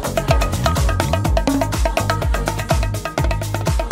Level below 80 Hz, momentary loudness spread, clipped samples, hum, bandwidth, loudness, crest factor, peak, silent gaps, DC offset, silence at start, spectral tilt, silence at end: -22 dBFS; 3 LU; under 0.1%; none; 16.5 kHz; -19 LUFS; 16 dB; -2 dBFS; none; under 0.1%; 0 s; -5.5 dB/octave; 0 s